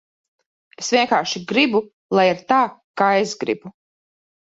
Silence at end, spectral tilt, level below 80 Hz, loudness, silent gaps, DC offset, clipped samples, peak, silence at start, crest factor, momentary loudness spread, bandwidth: 0.8 s; -3.5 dB/octave; -66 dBFS; -19 LUFS; 1.93-2.09 s, 2.84-2.94 s; under 0.1%; under 0.1%; -2 dBFS; 0.8 s; 18 dB; 8 LU; 8 kHz